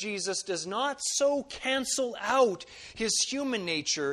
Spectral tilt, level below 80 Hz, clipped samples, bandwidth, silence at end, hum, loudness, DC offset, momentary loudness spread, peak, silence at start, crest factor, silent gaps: -1.5 dB/octave; -64 dBFS; under 0.1%; 13.5 kHz; 0 s; none; -29 LUFS; under 0.1%; 6 LU; -12 dBFS; 0 s; 18 dB; none